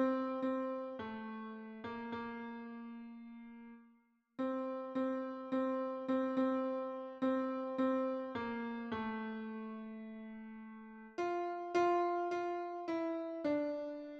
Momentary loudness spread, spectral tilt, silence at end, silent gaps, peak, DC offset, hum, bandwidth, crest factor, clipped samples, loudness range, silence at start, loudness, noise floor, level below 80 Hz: 15 LU; -6.5 dB/octave; 0 s; none; -22 dBFS; under 0.1%; none; 7.2 kHz; 16 dB; under 0.1%; 8 LU; 0 s; -39 LUFS; -71 dBFS; -78 dBFS